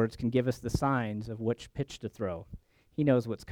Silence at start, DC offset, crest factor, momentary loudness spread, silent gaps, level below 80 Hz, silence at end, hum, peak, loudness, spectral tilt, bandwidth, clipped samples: 0 s; under 0.1%; 18 dB; 11 LU; none; -50 dBFS; 0 s; none; -14 dBFS; -32 LUFS; -7 dB/octave; 17 kHz; under 0.1%